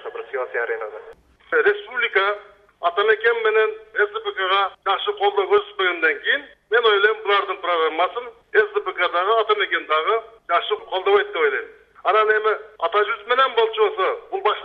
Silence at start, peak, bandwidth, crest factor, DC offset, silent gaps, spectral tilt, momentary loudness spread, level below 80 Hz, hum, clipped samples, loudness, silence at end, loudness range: 0 s; -2 dBFS; 5.2 kHz; 18 dB; under 0.1%; none; -4 dB/octave; 7 LU; -66 dBFS; none; under 0.1%; -20 LUFS; 0 s; 1 LU